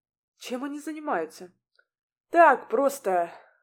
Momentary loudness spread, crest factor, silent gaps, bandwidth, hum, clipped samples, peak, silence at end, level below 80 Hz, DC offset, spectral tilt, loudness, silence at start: 17 LU; 22 dB; 2.03-2.24 s; 19 kHz; none; under 0.1%; -6 dBFS; 0.25 s; -88 dBFS; under 0.1%; -4 dB/octave; -25 LUFS; 0.4 s